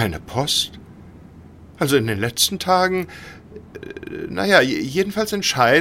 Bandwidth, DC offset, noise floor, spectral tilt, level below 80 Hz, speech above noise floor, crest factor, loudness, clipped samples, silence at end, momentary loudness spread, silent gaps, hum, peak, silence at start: 16.5 kHz; under 0.1%; -43 dBFS; -3.5 dB/octave; -48 dBFS; 23 dB; 20 dB; -19 LUFS; under 0.1%; 0 s; 21 LU; none; none; 0 dBFS; 0 s